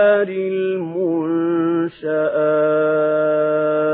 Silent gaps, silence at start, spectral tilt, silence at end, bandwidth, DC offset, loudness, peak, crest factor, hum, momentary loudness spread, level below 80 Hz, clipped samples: none; 0 s; -12 dB/octave; 0 s; 4 kHz; under 0.1%; -18 LUFS; -4 dBFS; 14 dB; none; 5 LU; -70 dBFS; under 0.1%